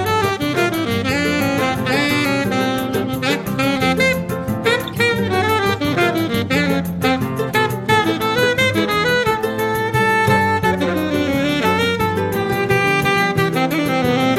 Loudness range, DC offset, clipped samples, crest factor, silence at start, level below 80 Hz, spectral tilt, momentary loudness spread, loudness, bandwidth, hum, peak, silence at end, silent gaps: 2 LU; under 0.1%; under 0.1%; 16 dB; 0 s; -44 dBFS; -5 dB/octave; 4 LU; -17 LUFS; 16.5 kHz; none; -2 dBFS; 0 s; none